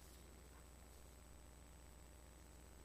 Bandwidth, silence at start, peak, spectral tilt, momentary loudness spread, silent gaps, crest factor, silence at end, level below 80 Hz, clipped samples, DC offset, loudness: 15 kHz; 0 s; -48 dBFS; -4 dB/octave; 1 LU; none; 14 dB; 0 s; -64 dBFS; under 0.1%; under 0.1%; -63 LUFS